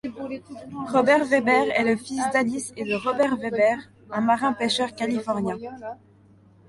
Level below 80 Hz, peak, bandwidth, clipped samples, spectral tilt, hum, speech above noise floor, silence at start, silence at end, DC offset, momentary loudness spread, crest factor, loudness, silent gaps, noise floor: -64 dBFS; -6 dBFS; 11.5 kHz; under 0.1%; -4.5 dB/octave; none; 31 dB; 0.05 s; 0.75 s; under 0.1%; 15 LU; 18 dB; -23 LUFS; none; -54 dBFS